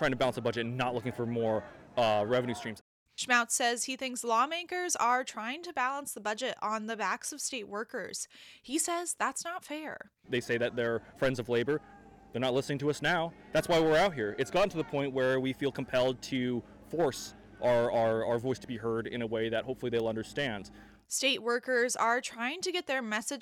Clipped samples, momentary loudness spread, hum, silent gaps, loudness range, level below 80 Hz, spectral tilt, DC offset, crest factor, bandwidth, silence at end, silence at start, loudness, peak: under 0.1%; 10 LU; none; 2.81-3.06 s; 5 LU; -62 dBFS; -3.5 dB/octave; under 0.1%; 20 dB; 18 kHz; 0 s; 0 s; -32 LUFS; -12 dBFS